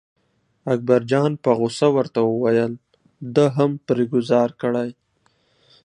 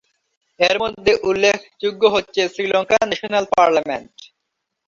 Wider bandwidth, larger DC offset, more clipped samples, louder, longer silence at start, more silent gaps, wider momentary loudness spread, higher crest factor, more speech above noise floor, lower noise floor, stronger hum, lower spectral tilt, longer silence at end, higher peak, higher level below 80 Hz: first, 10.5 kHz vs 7.6 kHz; neither; neither; about the same, -20 LUFS vs -18 LUFS; about the same, 0.65 s vs 0.6 s; neither; about the same, 8 LU vs 6 LU; about the same, 18 dB vs 18 dB; second, 47 dB vs 59 dB; second, -66 dBFS vs -77 dBFS; neither; first, -7 dB/octave vs -3 dB/octave; first, 0.95 s vs 0.6 s; about the same, -2 dBFS vs -2 dBFS; second, -66 dBFS vs -54 dBFS